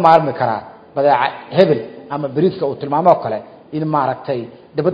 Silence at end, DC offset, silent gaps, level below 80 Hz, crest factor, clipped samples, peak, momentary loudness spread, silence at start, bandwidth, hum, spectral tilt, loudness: 0 s; under 0.1%; none; -58 dBFS; 16 dB; 0.1%; 0 dBFS; 12 LU; 0 s; 8 kHz; none; -8.5 dB/octave; -17 LUFS